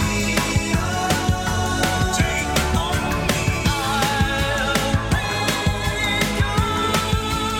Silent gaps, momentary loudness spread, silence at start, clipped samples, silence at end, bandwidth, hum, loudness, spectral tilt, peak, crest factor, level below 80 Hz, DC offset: none; 2 LU; 0 s; under 0.1%; 0 s; 18.5 kHz; none; -20 LUFS; -4 dB/octave; -4 dBFS; 16 dB; -30 dBFS; under 0.1%